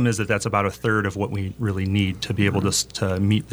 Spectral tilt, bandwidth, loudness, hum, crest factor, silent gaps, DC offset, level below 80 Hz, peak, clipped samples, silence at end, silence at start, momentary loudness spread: -5 dB/octave; 19.5 kHz; -23 LUFS; none; 18 dB; none; under 0.1%; -50 dBFS; -4 dBFS; under 0.1%; 0 s; 0 s; 5 LU